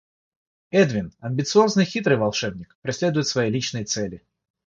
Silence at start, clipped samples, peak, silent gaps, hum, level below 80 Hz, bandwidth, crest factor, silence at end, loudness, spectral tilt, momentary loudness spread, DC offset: 0.75 s; under 0.1%; -4 dBFS; 2.75-2.82 s; none; -56 dBFS; 7.8 kHz; 18 dB; 0.5 s; -22 LUFS; -5 dB/octave; 11 LU; under 0.1%